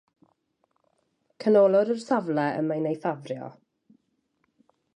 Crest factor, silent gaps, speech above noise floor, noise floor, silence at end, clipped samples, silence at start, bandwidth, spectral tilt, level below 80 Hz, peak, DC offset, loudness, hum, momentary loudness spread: 18 dB; none; 49 dB; -73 dBFS; 1.45 s; under 0.1%; 1.4 s; 9.8 kHz; -7.5 dB/octave; -80 dBFS; -10 dBFS; under 0.1%; -24 LUFS; none; 17 LU